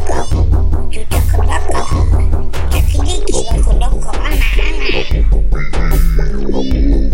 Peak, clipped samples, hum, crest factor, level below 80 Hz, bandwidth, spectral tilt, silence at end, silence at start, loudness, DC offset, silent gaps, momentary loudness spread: 0 dBFS; under 0.1%; none; 8 dB; -12 dBFS; 16 kHz; -5.5 dB/octave; 0 s; 0 s; -16 LUFS; under 0.1%; none; 4 LU